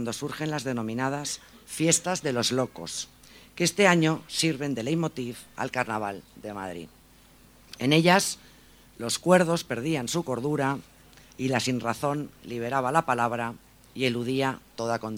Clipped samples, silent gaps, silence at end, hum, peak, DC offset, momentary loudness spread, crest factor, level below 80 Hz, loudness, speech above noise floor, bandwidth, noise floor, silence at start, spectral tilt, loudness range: under 0.1%; none; 0 s; none; -6 dBFS; under 0.1%; 15 LU; 22 dB; -62 dBFS; -27 LUFS; 28 dB; 19 kHz; -55 dBFS; 0 s; -4 dB/octave; 4 LU